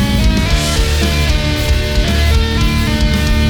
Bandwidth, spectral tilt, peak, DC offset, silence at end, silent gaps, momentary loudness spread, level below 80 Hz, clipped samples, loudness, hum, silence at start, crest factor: 19 kHz; -5 dB/octave; -2 dBFS; under 0.1%; 0 s; none; 2 LU; -14 dBFS; under 0.1%; -14 LUFS; none; 0 s; 10 dB